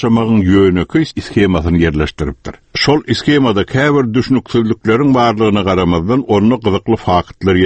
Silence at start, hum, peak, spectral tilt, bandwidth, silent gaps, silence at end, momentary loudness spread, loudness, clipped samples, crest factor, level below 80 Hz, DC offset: 0 s; none; 0 dBFS; -7 dB/octave; 8.6 kHz; none; 0 s; 5 LU; -13 LUFS; under 0.1%; 12 dB; -32 dBFS; under 0.1%